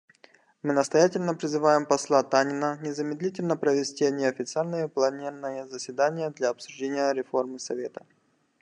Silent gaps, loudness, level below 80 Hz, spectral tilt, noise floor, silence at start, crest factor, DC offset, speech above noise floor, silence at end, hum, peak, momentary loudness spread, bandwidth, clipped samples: none; -27 LUFS; -78 dBFS; -4.5 dB/octave; -59 dBFS; 0.65 s; 20 dB; under 0.1%; 33 dB; 0.6 s; none; -6 dBFS; 12 LU; 10.5 kHz; under 0.1%